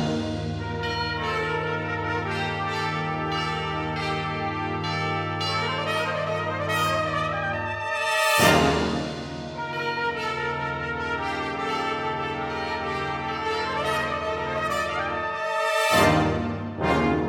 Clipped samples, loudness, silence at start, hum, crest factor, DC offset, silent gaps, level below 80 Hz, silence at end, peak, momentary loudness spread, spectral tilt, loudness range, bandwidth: under 0.1%; -25 LUFS; 0 s; none; 20 dB; under 0.1%; none; -46 dBFS; 0 s; -4 dBFS; 8 LU; -4.5 dB/octave; 5 LU; 19 kHz